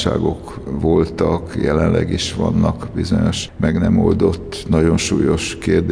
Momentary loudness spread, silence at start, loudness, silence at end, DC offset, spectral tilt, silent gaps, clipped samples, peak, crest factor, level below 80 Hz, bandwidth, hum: 6 LU; 0 s; -17 LUFS; 0 s; under 0.1%; -6 dB/octave; none; under 0.1%; -4 dBFS; 12 dB; -32 dBFS; 10.5 kHz; none